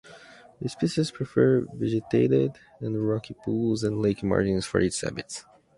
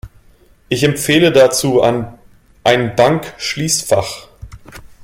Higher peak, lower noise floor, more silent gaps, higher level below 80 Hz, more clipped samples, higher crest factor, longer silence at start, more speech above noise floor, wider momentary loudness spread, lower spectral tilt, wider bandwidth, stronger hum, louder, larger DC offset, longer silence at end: second, -6 dBFS vs 0 dBFS; about the same, -50 dBFS vs -48 dBFS; neither; second, -52 dBFS vs -44 dBFS; neither; about the same, 20 dB vs 16 dB; about the same, 0.05 s vs 0.05 s; second, 24 dB vs 35 dB; about the same, 13 LU vs 12 LU; first, -6 dB/octave vs -4 dB/octave; second, 11.5 kHz vs 16.5 kHz; neither; second, -26 LUFS vs -14 LUFS; neither; about the same, 0.35 s vs 0.25 s